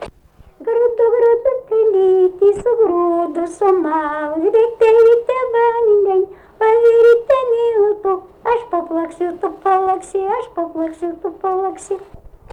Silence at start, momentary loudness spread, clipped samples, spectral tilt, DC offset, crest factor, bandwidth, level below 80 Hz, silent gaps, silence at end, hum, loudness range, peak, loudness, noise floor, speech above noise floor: 0 s; 12 LU; under 0.1%; -5.5 dB/octave; under 0.1%; 10 dB; 9.8 kHz; -50 dBFS; none; 0.35 s; none; 7 LU; -4 dBFS; -15 LUFS; -47 dBFS; 31 dB